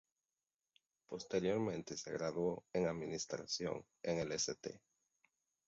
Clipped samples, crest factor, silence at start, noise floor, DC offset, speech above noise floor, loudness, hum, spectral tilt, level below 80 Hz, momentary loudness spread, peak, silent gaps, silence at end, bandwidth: under 0.1%; 18 dB; 1.1 s; under -90 dBFS; under 0.1%; over 49 dB; -41 LUFS; none; -4.5 dB/octave; -72 dBFS; 11 LU; -24 dBFS; none; 0.9 s; 7.6 kHz